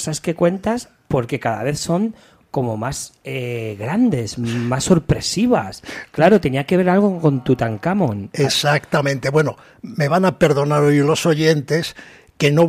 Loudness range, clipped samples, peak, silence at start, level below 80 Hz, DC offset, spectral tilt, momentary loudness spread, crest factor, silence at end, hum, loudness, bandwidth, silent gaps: 5 LU; under 0.1%; -2 dBFS; 0 s; -46 dBFS; under 0.1%; -5.5 dB/octave; 11 LU; 14 dB; 0 s; none; -18 LUFS; 15.5 kHz; none